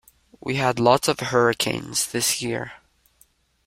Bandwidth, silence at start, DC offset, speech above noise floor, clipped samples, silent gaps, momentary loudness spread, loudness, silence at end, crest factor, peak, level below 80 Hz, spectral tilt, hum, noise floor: 16.5 kHz; 0.45 s; under 0.1%; 39 dB; under 0.1%; none; 11 LU; -22 LUFS; 0.9 s; 22 dB; -2 dBFS; -58 dBFS; -3.5 dB/octave; none; -61 dBFS